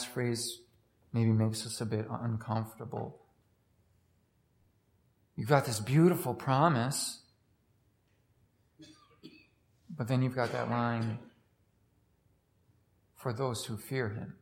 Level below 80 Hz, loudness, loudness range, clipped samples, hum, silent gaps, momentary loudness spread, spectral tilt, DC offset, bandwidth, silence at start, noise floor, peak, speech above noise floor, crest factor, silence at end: -74 dBFS; -32 LUFS; 10 LU; under 0.1%; none; none; 14 LU; -5.5 dB/octave; under 0.1%; 16.5 kHz; 0 s; -71 dBFS; -10 dBFS; 40 dB; 24 dB; 0.05 s